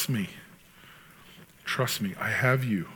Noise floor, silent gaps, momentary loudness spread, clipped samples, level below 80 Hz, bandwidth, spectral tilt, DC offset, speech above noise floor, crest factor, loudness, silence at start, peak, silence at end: -53 dBFS; none; 14 LU; under 0.1%; -68 dBFS; 19 kHz; -5 dB/octave; under 0.1%; 25 dB; 20 dB; -28 LUFS; 0 s; -10 dBFS; 0 s